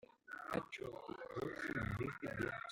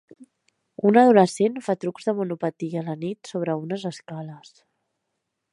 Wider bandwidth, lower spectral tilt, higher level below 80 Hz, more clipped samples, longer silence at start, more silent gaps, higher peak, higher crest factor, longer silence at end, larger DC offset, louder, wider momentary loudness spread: first, 16.5 kHz vs 11.5 kHz; about the same, -6.5 dB/octave vs -6.5 dB/octave; first, -64 dBFS vs -76 dBFS; neither; about the same, 0.3 s vs 0.2 s; neither; second, -24 dBFS vs -4 dBFS; about the same, 20 dB vs 20 dB; second, 0 s vs 1.15 s; neither; second, -45 LUFS vs -23 LUFS; second, 8 LU vs 18 LU